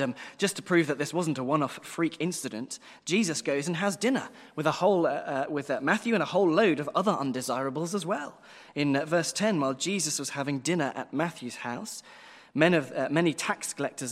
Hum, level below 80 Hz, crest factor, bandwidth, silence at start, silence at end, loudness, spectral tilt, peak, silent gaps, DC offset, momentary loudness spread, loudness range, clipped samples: none; -76 dBFS; 24 dB; 16 kHz; 0 s; 0 s; -28 LUFS; -4.5 dB/octave; -6 dBFS; none; under 0.1%; 11 LU; 3 LU; under 0.1%